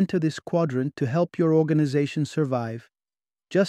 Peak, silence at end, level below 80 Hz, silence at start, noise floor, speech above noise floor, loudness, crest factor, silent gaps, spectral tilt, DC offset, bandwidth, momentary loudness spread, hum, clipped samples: -8 dBFS; 0 s; -68 dBFS; 0 s; under -90 dBFS; over 66 dB; -24 LUFS; 16 dB; none; -7.5 dB/octave; under 0.1%; 10 kHz; 6 LU; none; under 0.1%